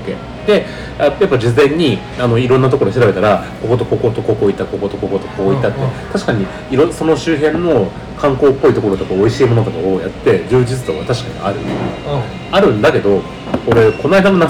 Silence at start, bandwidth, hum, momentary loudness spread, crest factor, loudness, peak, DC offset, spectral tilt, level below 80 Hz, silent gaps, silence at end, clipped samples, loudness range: 0 s; 12.5 kHz; none; 9 LU; 10 dB; -14 LUFS; -4 dBFS; under 0.1%; -7 dB/octave; -36 dBFS; none; 0 s; under 0.1%; 3 LU